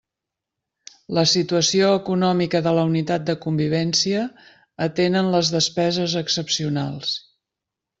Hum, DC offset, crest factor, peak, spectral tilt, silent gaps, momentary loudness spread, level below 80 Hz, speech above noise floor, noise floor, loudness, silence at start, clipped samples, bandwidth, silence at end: none; under 0.1%; 18 dB; -4 dBFS; -4.5 dB/octave; none; 8 LU; -60 dBFS; 65 dB; -85 dBFS; -20 LUFS; 1.1 s; under 0.1%; 8 kHz; 0.8 s